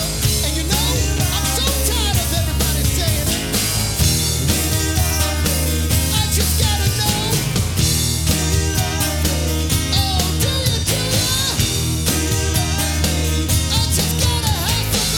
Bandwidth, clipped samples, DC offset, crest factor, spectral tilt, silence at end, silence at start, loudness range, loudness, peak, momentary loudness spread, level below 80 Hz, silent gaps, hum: 19.5 kHz; under 0.1%; under 0.1%; 14 dB; -3.5 dB/octave; 0 s; 0 s; 1 LU; -17 LUFS; -2 dBFS; 2 LU; -26 dBFS; none; none